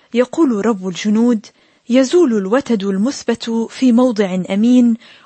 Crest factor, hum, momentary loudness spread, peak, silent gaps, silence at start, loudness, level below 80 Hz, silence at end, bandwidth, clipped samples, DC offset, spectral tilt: 12 dB; none; 7 LU; -2 dBFS; none; 0.15 s; -15 LUFS; -62 dBFS; 0.3 s; 8.6 kHz; under 0.1%; under 0.1%; -6 dB/octave